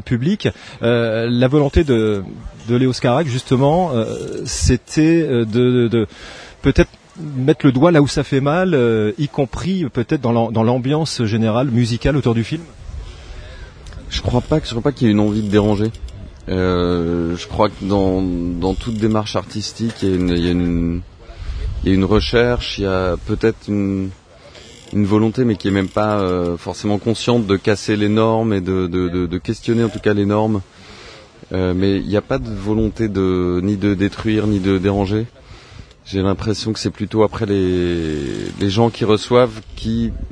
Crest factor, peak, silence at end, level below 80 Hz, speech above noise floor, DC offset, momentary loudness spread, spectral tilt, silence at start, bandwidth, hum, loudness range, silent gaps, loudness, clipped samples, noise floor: 18 dB; 0 dBFS; 0 s; -32 dBFS; 25 dB; under 0.1%; 10 LU; -6.5 dB/octave; 0.05 s; 10.5 kHz; none; 4 LU; none; -18 LUFS; under 0.1%; -41 dBFS